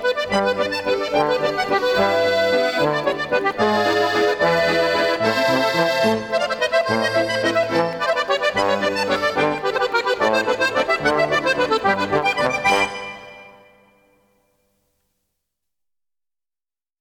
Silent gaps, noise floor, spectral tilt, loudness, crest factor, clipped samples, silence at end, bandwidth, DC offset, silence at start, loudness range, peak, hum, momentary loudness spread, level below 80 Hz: none; under -90 dBFS; -4 dB/octave; -19 LUFS; 16 dB; under 0.1%; 3.5 s; 18.5 kHz; under 0.1%; 0 s; 4 LU; -4 dBFS; none; 3 LU; -54 dBFS